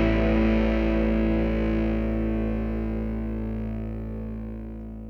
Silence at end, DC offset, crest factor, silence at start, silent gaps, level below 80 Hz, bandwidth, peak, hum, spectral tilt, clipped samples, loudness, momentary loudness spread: 0 s; under 0.1%; 14 dB; 0 s; none; -30 dBFS; 5.8 kHz; -10 dBFS; none; -9 dB/octave; under 0.1%; -26 LUFS; 12 LU